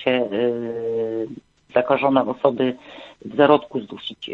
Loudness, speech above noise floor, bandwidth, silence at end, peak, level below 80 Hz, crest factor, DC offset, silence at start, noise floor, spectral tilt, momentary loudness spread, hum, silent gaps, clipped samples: -21 LUFS; 20 dB; 7 kHz; 0 s; -2 dBFS; -62 dBFS; 20 dB; under 0.1%; 0 s; -40 dBFS; -7.5 dB/octave; 17 LU; none; none; under 0.1%